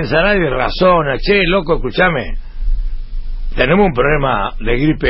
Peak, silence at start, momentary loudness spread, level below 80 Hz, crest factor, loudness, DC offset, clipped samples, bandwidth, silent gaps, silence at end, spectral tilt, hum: 0 dBFS; 0 s; 16 LU; -22 dBFS; 14 dB; -14 LUFS; under 0.1%; under 0.1%; 5.8 kHz; none; 0 s; -11 dB/octave; none